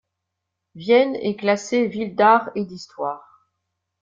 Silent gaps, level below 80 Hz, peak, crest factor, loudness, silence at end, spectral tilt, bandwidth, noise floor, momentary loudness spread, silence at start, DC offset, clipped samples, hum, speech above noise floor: none; -66 dBFS; -4 dBFS; 18 dB; -20 LUFS; 0.85 s; -5 dB/octave; 7.6 kHz; -80 dBFS; 14 LU; 0.75 s; under 0.1%; under 0.1%; none; 61 dB